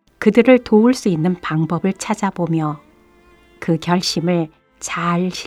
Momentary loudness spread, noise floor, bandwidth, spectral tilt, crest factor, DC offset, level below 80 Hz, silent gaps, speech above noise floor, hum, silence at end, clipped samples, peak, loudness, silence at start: 13 LU; -50 dBFS; 14 kHz; -6 dB/octave; 18 dB; under 0.1%; -54 dBFS; none; 34 dB; none; 0 s; under 0.1%; 0 dBFS; -17 LUFS; 0.2 s